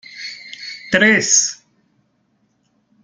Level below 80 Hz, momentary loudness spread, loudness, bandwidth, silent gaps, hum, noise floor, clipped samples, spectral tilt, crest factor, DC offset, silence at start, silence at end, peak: -58 dBFS; 19 LU; -13 LUFS; 10.5 kHz; none; none; -64 dBFS; under 0.1%; -1.5 dB/octave; 20 dB; under 0.1%; 0.1 s; 1.5 s; -2 dBFS